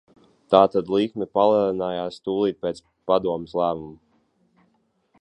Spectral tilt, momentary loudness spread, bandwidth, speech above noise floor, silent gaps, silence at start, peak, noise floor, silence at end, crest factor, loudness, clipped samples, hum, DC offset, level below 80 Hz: -7.5 dB/octave; 13 LU; 9.2 kHz; 45 dB; none; 0.5 s; -2 dBFS; -67 dBFS; 1.25 s; 22 dB; -22 LUFS; under 0.1%; none; under 0.1%; -60 dBFS